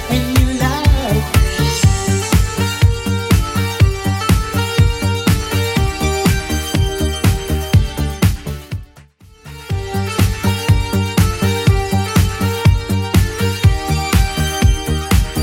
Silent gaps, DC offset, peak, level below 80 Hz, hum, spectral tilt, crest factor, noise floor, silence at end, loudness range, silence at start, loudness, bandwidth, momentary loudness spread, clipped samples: none; under 0.1%; 0 dBFS; -22 dBFS; none; -5 dB/octave; 14 dB; -43 dBFS; 0 s; 4 LU; 0 s; -16 LUFS; 17 kHz; 5 LU; under 0.1%